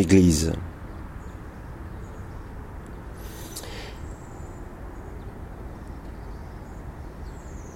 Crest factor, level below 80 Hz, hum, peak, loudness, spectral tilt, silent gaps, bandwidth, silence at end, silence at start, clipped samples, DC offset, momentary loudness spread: 24 dB; -40 dBFS; none; -4 dBFS; -31 LUFS; -6 dB/octave; none; 16 kHz; 0 s; 0 s; under 0.1%; under 0.1%; 13 LU